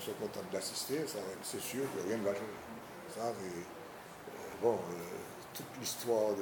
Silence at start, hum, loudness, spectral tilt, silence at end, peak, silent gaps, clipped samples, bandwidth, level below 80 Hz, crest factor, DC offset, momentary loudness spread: 0 s; none; -39 LUFS; -3.5 dB/octave; 0 s; -20 dBFS; none; under 0.1%; 20 kHz; -74 dBFS; 20 dB; under 0.1%; 14 LU